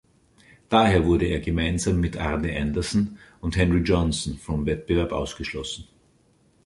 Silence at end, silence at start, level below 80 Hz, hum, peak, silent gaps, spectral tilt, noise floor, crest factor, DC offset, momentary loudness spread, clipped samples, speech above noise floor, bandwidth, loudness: 0.85 s; 0.7 s; -34 dBFS; none; -4 dBFS; none; -5.5 dB/octave; -61 dBFS; 20 dB; under 0.1%; 11 LU; under 0.1%; 38 dB; 11.5 kHz; -24 LUFS